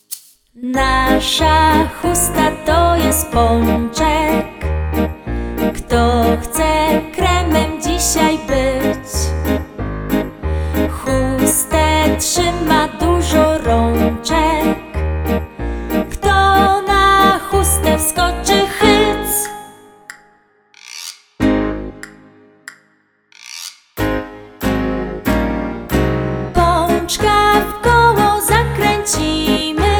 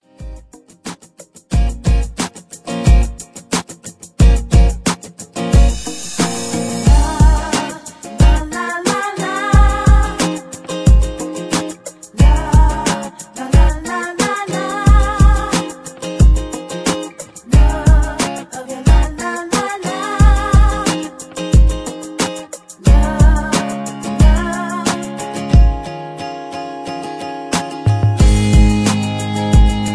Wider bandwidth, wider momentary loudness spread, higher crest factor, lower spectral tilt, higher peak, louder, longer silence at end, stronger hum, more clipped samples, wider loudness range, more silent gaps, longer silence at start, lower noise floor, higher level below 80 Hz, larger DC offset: first, over 20 kHz vs 11 kHz; second, 11 LU vs 14 LU; about the same, 16 dB vs 14 dB; second, -4 dB/octave vs -5.5 dB/octave; about the same, 0 dBFS vs 0 dBFS; about the same, -15 LUFS vs -16 LUFS; about the same, 0 s vs 0 s; neither; neither; first, 9 LU vs 2 LU; neither; about the same, 0.1 s vs 0.2 s; first, -57 dBFS vs -42 dBFS; second, -24 dBFS vs -16 dBFS; neither